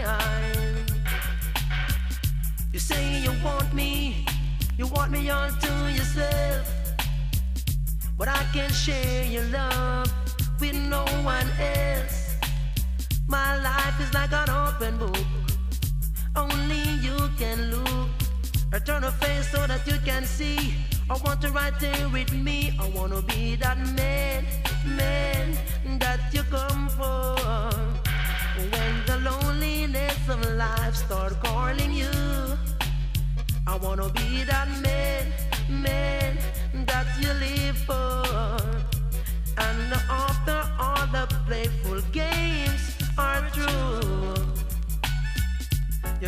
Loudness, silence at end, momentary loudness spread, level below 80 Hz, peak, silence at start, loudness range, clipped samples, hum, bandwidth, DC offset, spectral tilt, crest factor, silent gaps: -27 LUFS; 0 s; 4 LU; -28 dBFS; -10 dBFS; 0 s; 1 LU; under 0.1%; none; 15.5 kHz; under 0.1%; -4.5 dB/octave; 16 dB; none